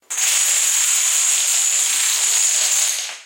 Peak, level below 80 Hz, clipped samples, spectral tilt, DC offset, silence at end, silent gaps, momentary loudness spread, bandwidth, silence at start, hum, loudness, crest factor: -4 dBFS; -88 dBFS; under 0.1%; 6.5 dB/octave; under 0.1%; 0 s; none; 2 LU; 17 kHz; 0.1 s; none; -14 LUFS; 14 dB